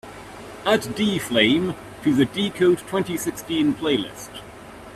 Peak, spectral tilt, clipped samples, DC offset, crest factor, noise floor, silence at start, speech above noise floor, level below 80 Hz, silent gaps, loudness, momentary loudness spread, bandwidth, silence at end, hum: -4 dBFS; -4.5 dB/octave; under 0.1%; under 0.1%; 20 dB; -41 dBFS; 0.05 s; 19 dB; -54 dBFS; none; -22 LUFS; 20 LU; 15 kHz; 0 s; none